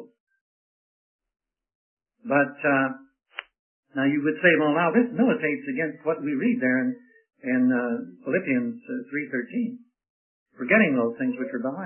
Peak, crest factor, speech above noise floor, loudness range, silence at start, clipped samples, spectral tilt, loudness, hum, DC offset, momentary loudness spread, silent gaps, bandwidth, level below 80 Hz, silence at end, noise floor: -6 dBFS; 20 dB; over 66 dB; 6 LU; 0 s; under 0.1%; -10.5 dB/octave; -24 LUFS; none; under 0.1%; 16 LU; 0.20-0.27 s, 0.41-1.19 s, 1.75-1.97 s, 3.59-3.83 s, 10.10-10.46 s; 3.3 kHz; -78 dBFS; 0 s; under -90 dBFS